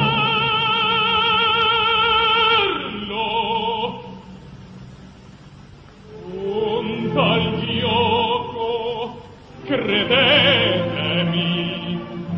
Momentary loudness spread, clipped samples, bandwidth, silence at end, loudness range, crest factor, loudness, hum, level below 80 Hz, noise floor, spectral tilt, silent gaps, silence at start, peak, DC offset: 13 LU; under 0.1%; 7.4 kHz; 0 s; 11 LU; 16 dB; -18 LUFS; none; -46 dBFS; -43 dBFS; -6.5 dB/octave; none; 0 s; -4 dBFS; under 0.1%